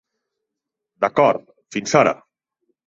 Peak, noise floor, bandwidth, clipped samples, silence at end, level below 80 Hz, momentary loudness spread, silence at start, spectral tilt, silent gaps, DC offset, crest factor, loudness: -2 dBFS; -83 dBFS; 8 kHz; under 0.1%; 0.75 s; -62 dBFS; 12 LU; 1 s; -4.5 dB/octave; none; under 0.1%; 20 dB; -19 LUFS